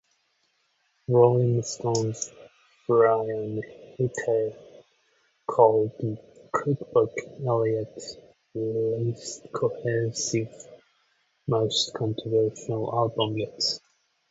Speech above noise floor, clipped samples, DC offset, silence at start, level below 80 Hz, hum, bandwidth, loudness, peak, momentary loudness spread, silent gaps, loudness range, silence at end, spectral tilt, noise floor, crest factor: 46 dB; under 0.1%; under 0.1%; 1.1 s; -64 dBFS; none; 8 kHz; -26 LUFS; -4 dBFS; 17 LU; none; 4 LU; 0.55 s; -5 dB/octave; -71 dBFS; 22 dB